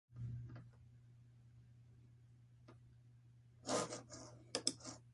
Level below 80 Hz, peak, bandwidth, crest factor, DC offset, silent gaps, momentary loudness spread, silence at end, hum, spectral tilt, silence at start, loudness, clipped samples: -72 dBFS; -20 dBFS; 11.5 kHz; 30 dB; under 0.1%; none; 25 LU; 0 s; none; -3 dB/octave; 0.1 s; -45 LUFS; under 0.1%